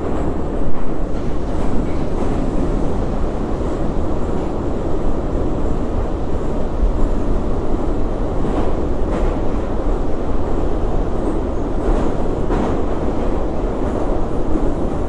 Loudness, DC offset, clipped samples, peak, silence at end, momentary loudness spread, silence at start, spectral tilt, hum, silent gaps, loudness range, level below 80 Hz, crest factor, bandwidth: -22 LUFS; under 0.1%; under 0.1%; -4 dBFS; 0 s; 2 LU; 0 s; -8.5 dB/octave; none; none; 1 LU; -20 dBFS; 12 dB; 8.2 kHz